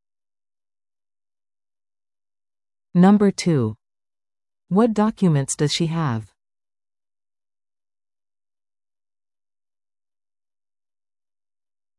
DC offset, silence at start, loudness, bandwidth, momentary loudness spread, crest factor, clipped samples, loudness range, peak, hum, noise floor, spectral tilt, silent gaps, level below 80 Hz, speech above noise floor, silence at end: under 0.1%; 2.95 s; -19 LUFS; 12 kHz; 10 LU; 20 dB; under 0.1%; 8 LU; -6 dBFS; none; under -90 dBFS; -6 dB/octave; none; -62 dBFS; over 72 dB; 5.75 s